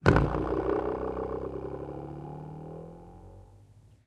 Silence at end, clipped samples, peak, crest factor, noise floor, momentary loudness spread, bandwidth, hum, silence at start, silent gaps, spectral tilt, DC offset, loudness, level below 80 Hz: 0.25 s; under 0.1%; -4 dBFS; 28 dB; -56 dBFS; 21 LU; 9.8 kHz; none; 0 s; none; -8 dB/octave; under 0.1%; -32 LUFS; -42 dBFS